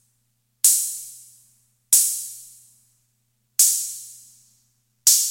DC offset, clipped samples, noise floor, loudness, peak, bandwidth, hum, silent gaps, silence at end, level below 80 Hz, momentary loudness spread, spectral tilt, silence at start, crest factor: under 0.1%; under 0.1%; -70 dBFS; -18 LUFS; 0 dBFS; 17 kHz; 60 Hz at -70 dBFS; none; 0 s; -76 dBFS; 21 LU; 5.5 dB/octave; 0.65 s; 24 dB